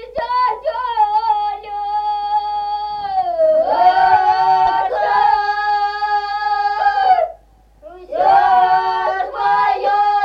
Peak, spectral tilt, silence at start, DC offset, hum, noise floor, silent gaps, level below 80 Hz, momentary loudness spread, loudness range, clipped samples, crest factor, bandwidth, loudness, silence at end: -2 dBFS; -4 dB/octave; 0 s; under 0.1%; none; -47 dBFS; none; -50 dBFS; 9 LU; 4 LU; under 0.1%; 14 dB; 6.4 kHz; -16 LUFS; 0 s